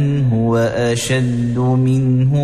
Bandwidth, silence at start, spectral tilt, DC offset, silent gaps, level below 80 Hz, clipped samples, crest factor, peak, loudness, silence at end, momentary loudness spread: 13 kHz; 0 s; -6.5 dB/octave; under 0.1%; none; -40 dBFS; under 0.1%; 12 dB; -4 dBFS; -16 LUFS; 0 s; 3 LU